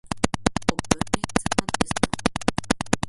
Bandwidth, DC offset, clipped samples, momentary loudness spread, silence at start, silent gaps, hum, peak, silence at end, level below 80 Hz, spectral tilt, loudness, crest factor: 12 kHz; under 0.1%; under 0.1%; 3 LU; 0.05 s; none; none; 0 dBFS; 0 s; -40 dBFS; -4 dB/octave; -25 LUFS; 24 dB